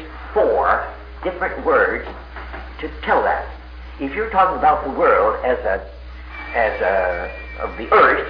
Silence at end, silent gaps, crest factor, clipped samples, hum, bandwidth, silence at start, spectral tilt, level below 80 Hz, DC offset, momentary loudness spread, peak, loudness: 0 s; none; 18 dB; under 0.1%; none; 5.4 kHz; 0 s; -8 dB/octave; -36 dBFS; under 0.1%; 18 LU; 0 dBFS; -19 LUFS